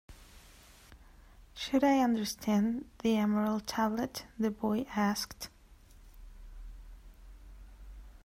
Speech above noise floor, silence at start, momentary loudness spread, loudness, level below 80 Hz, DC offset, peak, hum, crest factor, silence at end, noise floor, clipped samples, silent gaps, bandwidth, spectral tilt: 26 dB; 0.1 s; 25 LU; -32 LUFS; -54 dBFS; under 0.1%; -16 dBFS; none; 18 dB; 0.05 s; -57 dBFS; under 0.1%; none; 16 kHz; -5 dB/octave